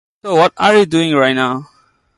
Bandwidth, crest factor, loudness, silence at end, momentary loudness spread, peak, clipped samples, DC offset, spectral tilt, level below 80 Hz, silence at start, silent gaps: 11.5 kHz; 14 dB; -13 LUFS; 0.55 s; 7 LU; 0 dBFS; under 0.1%; under 0.1%; -5 dB/octave; -56 dBFS; 0.25 s; none